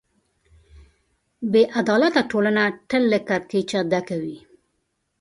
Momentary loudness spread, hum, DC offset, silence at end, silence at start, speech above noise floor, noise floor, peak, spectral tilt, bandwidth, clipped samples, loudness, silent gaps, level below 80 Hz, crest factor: 11 LU; none; under 0.1%; 0.85 s; 1.4 s; 53 dB; -73 dBFS; -4 dBFS; -5.5 dB/octave; 11 kHz; under 0.1%; -21 LUFS; none; -60 dBFS; 18 dB